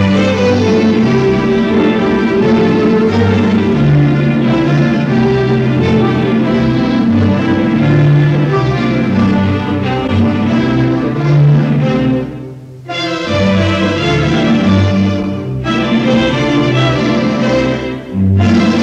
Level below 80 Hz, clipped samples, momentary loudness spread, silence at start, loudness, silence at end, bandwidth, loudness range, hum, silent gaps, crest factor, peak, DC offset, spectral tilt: -34 dBFS; under 0.1%; 5 LU; 0 s; -12 LUFS; 0 s; 8.2 kHz; 2 LU; none; none; 10 dB; 0 dBFS; under 0.1%; -7.5 dB/octave